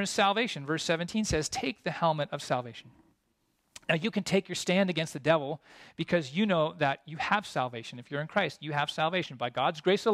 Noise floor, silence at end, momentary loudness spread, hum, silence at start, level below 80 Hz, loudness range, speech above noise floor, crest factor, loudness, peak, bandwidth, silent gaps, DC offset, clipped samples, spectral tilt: -75 dBFS; 0 s; 10 LU; none; 0 s; -58 dBFS; 3 LU; 45 dB; 20 dB; -30 LUFS; -10 dBFS; 14.5 kHz; none; under 0.1%; under 0.1%; -4.5 dB/octave